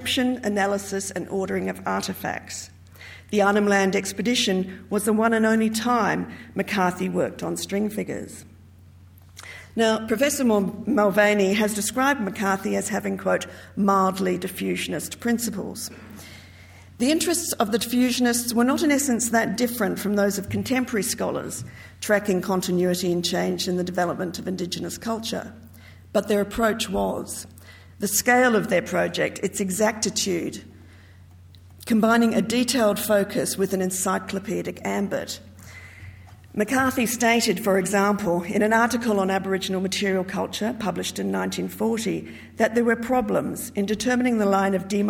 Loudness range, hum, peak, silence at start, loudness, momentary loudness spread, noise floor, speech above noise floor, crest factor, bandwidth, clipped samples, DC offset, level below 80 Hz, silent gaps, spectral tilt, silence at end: 5 LU; none; -6 dBFS; 0 s; -23 LUFS; 13 LU; -48 dBFS; 25 dB; 18 dB; 18.5 kHz; under 0.1%; under 0.1%; -56 dBFS; none; -4 dB/octave; 0 s